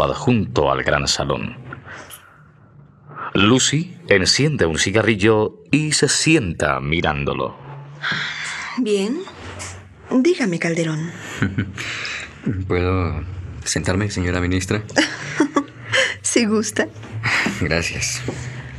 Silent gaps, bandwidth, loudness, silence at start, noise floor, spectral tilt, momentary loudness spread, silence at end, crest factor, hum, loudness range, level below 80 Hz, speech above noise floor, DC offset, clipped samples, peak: none; 13 kHz; -19 LUFS; 0 s; -47 dBFS; -4 dB/octave; 15 LU; 0 s; 20 dB; none; 6 LU; -44 dBFS; 28 dB; under 0.1%; under 0.1%; 0 dBFS